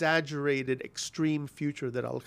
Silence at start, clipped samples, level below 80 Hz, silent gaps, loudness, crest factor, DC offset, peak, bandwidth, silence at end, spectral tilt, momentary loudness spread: 0 s; under 0.1%; -70 dBFS; none; -31 LUFS; 18 dB; under 0.1%; -12 dBFS; 15 kHz; 0.05 s; -5 dB/octave; 7 LU